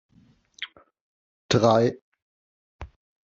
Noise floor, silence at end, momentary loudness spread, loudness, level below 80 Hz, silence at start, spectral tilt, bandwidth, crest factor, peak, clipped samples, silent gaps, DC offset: -57 dBFS; 0.4 s; 26 LU; -22 LUFS; -56 dBFS; 0.6 s; -5 dB/octave; 7.8 kHz; 22 dB; -6 dBFS; under 0.1%; 1.01-1.49 s, 2.02-2.12 s, 2.22-2.79 s; under 0.1%